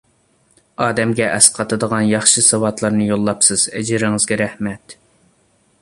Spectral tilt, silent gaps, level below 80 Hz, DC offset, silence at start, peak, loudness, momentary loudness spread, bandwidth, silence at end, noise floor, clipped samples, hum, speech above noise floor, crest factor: -3 dB/octave; none; -52 dBFS; under 0.1%; 0.8 s; 0 dBFS; -15 LUFS; 10 LU; 14 kHz; 0.9 s; -58 dBFS; under 0.1%; none; 42 dB; 18 dB